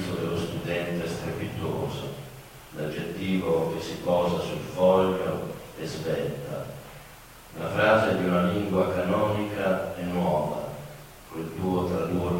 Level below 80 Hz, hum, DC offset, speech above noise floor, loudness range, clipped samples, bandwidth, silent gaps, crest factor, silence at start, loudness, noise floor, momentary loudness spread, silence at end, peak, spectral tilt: -52 dBFS; none; under 0.1%; 22 dB; 5 LU; under 0.1%; 16.5 kHz; none; 18 dB; 0 s; -27 LUFS; -47 dBFS; 19 LU; 0 s; -8 dBFS; -6.5 dB/octave